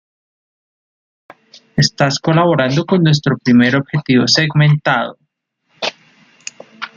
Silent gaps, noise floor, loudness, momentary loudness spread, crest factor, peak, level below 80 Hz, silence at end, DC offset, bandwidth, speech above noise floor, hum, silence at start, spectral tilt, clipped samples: none; -66 dBFS; -14 LUFS; 17 LU; 16 dB; 0 dBFS; -52 dBFS; 0.1 s; under 0.1%; 7.6 kHz; 53 dB; none; 1.75 s; -5.5 dB/octave; under 0.1%